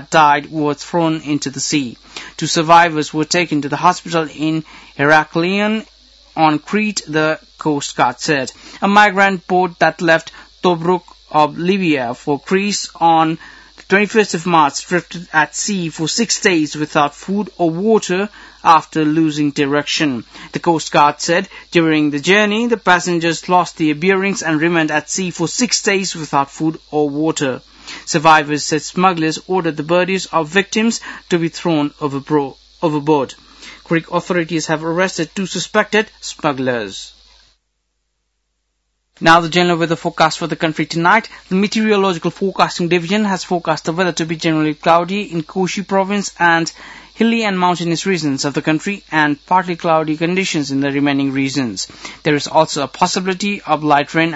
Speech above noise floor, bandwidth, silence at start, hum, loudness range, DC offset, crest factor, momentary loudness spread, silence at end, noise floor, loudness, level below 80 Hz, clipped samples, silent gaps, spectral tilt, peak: 54 dB; 8.2 kHz; 0 s; none; 4 LU; under 0.1%; 16 dB; 8 LU; 0 s; -69 dBFS; -16 LUFS; -54 dBFS; under 0.1%; none; -4 dB/octave; 0 dBFS